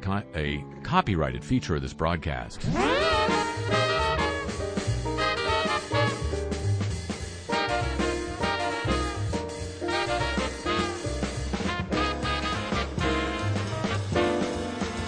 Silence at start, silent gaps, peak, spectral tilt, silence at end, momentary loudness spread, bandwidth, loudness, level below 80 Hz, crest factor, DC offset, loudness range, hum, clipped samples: 0 s; none; -8 dBFS; -5 dB/octave; 0 s; 7 LU; 10.5 kHz; -28 LUFS; -38 dBFS; 18 dB; under 0.1%; 3 LU; none; under 0.1%